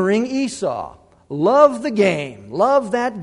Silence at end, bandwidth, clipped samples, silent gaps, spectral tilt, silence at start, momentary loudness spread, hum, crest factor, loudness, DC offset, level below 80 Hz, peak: 0 s; 11 kHz; under 0.1%; none; -5.5 dB/octave; 0 s; 15 LU; none; 18 dB; -18 LUFS; under 0.1%; -56 dBFS; 0 dBFS